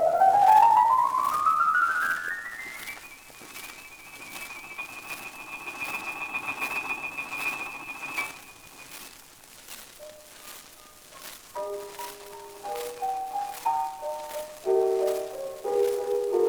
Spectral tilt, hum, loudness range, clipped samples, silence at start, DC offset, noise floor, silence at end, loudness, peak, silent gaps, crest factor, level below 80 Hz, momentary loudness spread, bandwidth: -2.5 dB/octave; none; 15 LU; under 0.1%; 0 s; under 0.1%; -50 dBFS; 0 s; -27 LUFS; -8 dBFS; none; 20 dB; -66 dBFS; 22 LU; over 20 kHz